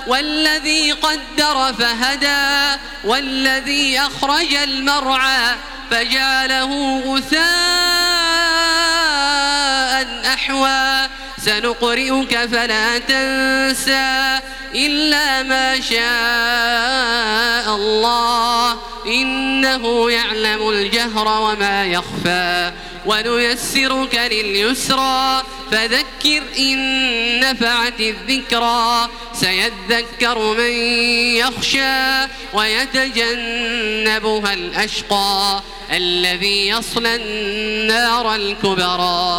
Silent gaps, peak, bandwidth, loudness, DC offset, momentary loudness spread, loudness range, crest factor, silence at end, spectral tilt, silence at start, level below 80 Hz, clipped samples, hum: none; 0 dBFS; over 20 kHz; -15 LUFS; under 0.1%; 5 LU; 2 LU; 16 dB; 0 s; -1.5 dB/octave; 0 s; -40 dBFS; under 0.1%; none